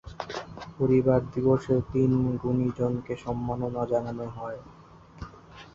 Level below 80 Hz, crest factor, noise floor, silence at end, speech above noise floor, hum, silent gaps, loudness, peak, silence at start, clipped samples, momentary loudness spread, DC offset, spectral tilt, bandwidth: -50 dBFS; 18 dB; -48 dBFS; 0.05 s; 22 dB; none; none; -27 LUFS; -10 dBFS; 0.05 s; under 0.1%; 19 LU; under 0.1%; -9 dB/octave; 7.4 kHz